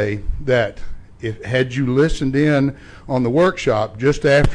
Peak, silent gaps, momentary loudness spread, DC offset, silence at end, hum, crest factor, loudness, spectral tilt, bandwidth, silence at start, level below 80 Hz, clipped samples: -4 dBFS; none; 10 LU; under 0.1%; 0 s; none; 14 dB; -18 LUFS; -6.5 dB/octave; 10.5 kHz; 0 s; -30 dBFS; under 0.1%